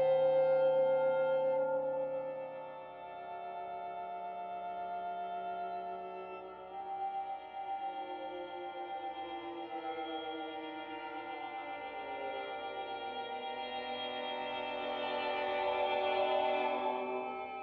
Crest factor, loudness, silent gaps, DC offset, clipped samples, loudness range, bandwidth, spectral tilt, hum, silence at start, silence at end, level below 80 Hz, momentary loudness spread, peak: 16 dB; -37 LUFS; none; under 0.1%; under 0.1%; 7 LU; 5 kHz; -1.5 dB/octave; none; 0 s; 0 s; -76 dBFS; 12 LU; -22 dBFS